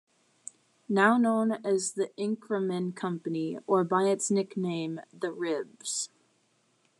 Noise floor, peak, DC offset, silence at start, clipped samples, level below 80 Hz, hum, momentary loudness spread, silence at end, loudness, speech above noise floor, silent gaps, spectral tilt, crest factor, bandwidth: -70 dBFS; -10 dBFS; under 0.1%; 0.9 s; under 0.1%; -90 dBFS; none; 12 LU; 0.95 s; -29 LUFS; 42 dB; none; -4.5 dB/octave; 20 dB; 12.5 kHz